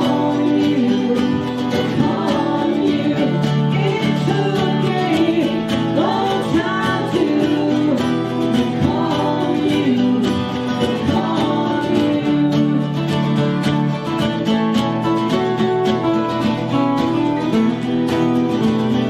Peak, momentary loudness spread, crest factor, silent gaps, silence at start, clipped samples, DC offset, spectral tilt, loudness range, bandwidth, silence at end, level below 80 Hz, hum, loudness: -2 dBFS; 3 LU; 16 dB; none; 0 s; under 0.1%; under 0.1%; -7 dB/octave; 1 LU; 13.5 kHz; 0 s; -50 dBFS; none; -17 LUFS